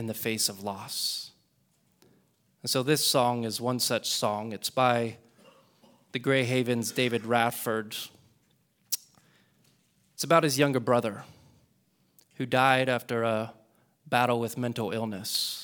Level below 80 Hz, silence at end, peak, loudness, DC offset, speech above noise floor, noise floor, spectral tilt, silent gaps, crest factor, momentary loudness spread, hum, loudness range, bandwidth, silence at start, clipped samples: -74 dBFS; 0 s; -6 dBFS; -28 LUFS; under 0.1%; 42 dB; -70 dBFS; -3.5 dB/octave; none; 24 dB; 13 LU; none; 3 LU; over 20 kHz; 0 s; under 0.1%